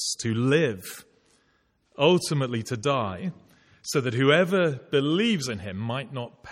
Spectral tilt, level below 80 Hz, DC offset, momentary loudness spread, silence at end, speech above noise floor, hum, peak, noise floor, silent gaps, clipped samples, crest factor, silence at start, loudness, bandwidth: -5 dB/octave; -64 dBFS; under 0.1%; 15 LU; 0 s; 43 dB; none; -6 dBFS; -68 dBFS; none; under 0.1%; 20 dB; 0 s; -25 LUFS; 16.5 kHz